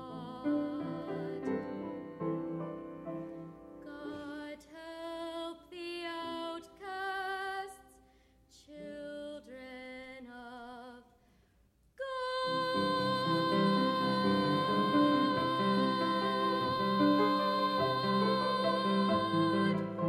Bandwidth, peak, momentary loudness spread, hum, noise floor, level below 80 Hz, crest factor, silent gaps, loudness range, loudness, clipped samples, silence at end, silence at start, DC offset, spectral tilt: 13 kHz; -16 dBFS; 18 LU; none; -69 dBFS; -70 dBFS; 18 dB; none; 17 LU; -33 LUFS; under 0.1%; 0 s; 0 s; under 0.1%; -6.5 dB/octave